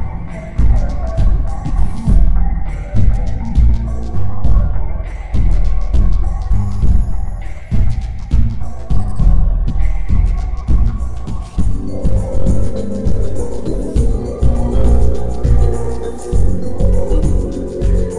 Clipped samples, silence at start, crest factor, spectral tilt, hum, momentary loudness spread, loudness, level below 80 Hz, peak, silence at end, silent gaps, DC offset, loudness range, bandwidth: under 0.1%; 0 s; 10 dB; -8.5 dB/octave; none; 7 LU; -18 LUFS; -16 dBFS; 0 dBFS; 0 s; none; under 0.1%; 2 LU; 10 kHz